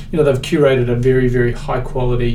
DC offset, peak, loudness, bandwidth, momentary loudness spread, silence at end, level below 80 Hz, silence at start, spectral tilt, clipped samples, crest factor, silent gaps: under 0.1%; 0 dBFS; -16 LUFS; 12.5 kHz; 6 LU; 0 s; -24 dBFS; 0 s; -7.5 dB/octave; under 0.1%; 14 dB; none